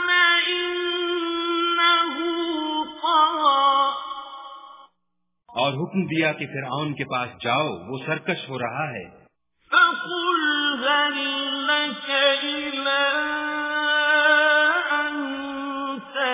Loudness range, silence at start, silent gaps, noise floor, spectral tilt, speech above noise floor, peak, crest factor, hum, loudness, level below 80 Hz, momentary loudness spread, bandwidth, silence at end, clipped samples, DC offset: 6 LU; 0 s; none; -79 dBFS; -1 dB/octave; 54 dB; -6 dBFS; 18 dB; none; -21 LUFS; -66 dBFS; 12 LU; 3.9 kHz; 0 s; under 0.1%; under 0.1%